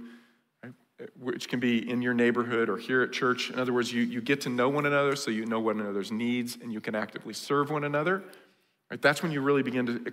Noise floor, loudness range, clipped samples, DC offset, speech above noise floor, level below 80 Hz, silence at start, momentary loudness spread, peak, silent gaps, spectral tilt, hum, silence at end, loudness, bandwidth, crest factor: -58 dBFS; 3 LU; under 0.1%; under 0.1%; 30 dB; -78 dBFS; 0 s; 10 LU; -10 dBFS; none; -5 dB/octave; none; 0 s; -28 LUFS; 16 kHz; 18 dB